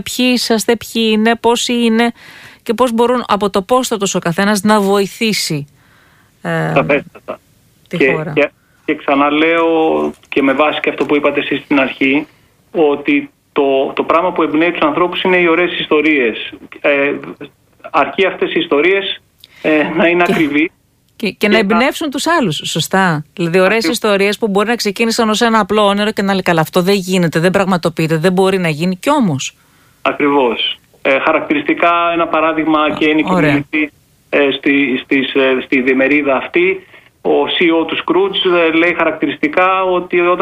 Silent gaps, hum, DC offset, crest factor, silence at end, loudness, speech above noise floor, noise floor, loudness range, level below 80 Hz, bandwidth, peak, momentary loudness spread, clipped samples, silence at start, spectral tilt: none; none; under 0.1%; 14 dB; 0 s; -13 LUFS; 36 dB; -49 dBFS; 2 LU; -50 dBFS; 15.5 kHz; 0 dBFS; 7 LU; under 0.1%; 0.05 s; -4.5 dB/octave